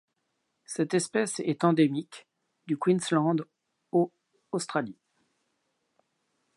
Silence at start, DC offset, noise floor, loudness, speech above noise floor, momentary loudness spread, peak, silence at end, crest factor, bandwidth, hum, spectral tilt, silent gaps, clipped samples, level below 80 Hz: 0.7 s; under 0.1%; -79 dBFS; -28 LUFS; 52 dB; 11 LU; -8 dBFS; 1.65 s; 22 dB; 11.5 kHz; none; -5.5 dB/octave; none; under 0.1%; -80 dBFS